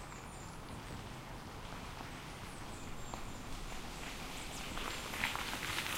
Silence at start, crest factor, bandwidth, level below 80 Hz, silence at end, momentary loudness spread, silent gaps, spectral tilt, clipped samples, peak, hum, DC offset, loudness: 0 s; 28 dB; 16 kHz; -52 dBFS; 0 s; 10 LU; none; -3 dB/octave; under 0.1%; -16 dBFS; none; under 0.1%; -44 LUFS